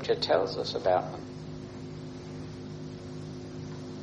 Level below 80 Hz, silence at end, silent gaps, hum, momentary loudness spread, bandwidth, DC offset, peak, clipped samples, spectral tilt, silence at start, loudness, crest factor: -58 dBFS; 0 s; none; none; 15 LU; 9.4 kHz; under 0.1%; -12 dBFS; under 0.1%; -5.5 dB/octave; 0 s; -33 LUFS; 22 dB